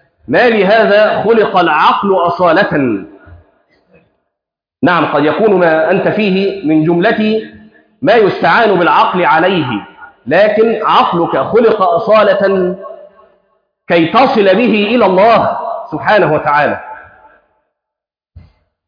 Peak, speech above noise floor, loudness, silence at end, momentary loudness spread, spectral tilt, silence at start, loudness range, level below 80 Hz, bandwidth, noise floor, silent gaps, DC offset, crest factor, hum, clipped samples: 0 dBFS; 72 dB; -10 LUFS; 0.5 s; 8 LU; -8 dB/octave; 0.3 s; 4 LU; -50 dBFS; 5.2 kHz; -82 dBFS; none; under 0.1%; 12 dB; none; under 0.1%